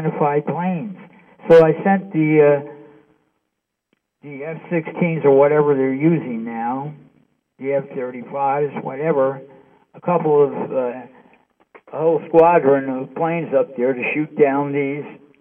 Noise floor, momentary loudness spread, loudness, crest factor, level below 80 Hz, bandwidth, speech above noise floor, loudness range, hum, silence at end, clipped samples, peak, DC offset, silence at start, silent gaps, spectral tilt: -77 dBFS; 17 LU; -18 LUFS; 16 dB; -62 dBFS; 5.2 kHz; 59 dB; 5 LU; none; 0.25 s; under 0.1%; -2 dBFS; under 0.1%; 0 s; none; -10 dB/octave